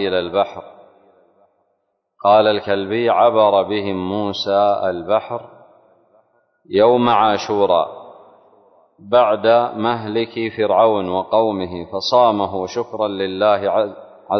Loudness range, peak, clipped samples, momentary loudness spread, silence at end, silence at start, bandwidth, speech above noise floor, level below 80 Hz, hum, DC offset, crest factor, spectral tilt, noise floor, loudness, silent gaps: 2 LU; -2 dBFS; under 0.1%; 10 LU; 0 s; 0 s; 6.4 kHz; 53 dB; -54 dBFS; none; under 0.1%; 16 dB; -6 dB/octave; -70 dBFS; -17 LUFS; none